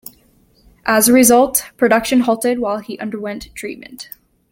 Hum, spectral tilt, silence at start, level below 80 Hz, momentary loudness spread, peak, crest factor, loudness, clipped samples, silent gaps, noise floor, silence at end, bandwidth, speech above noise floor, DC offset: none; -3 dB/octave; 0.85 s; -50 dBFS; 21 LU; 0 dBFS; 16 dB; -14 LUFS; under 0.1%; none; -54 dBFS; 0.45 s; 17 kHz; 38 dB; under 0.1%